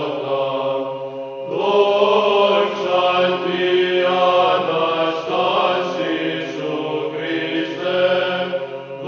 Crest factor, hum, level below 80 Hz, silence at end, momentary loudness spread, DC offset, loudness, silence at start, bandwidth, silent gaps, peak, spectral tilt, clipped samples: 16 dB; none; -72 dBFS; 0 s; 9 LU; under 0.1%; -18 LUFS; 0 s; 7 kHz; none; -2 dBFS; -5.5 dB/octave; under 0.1%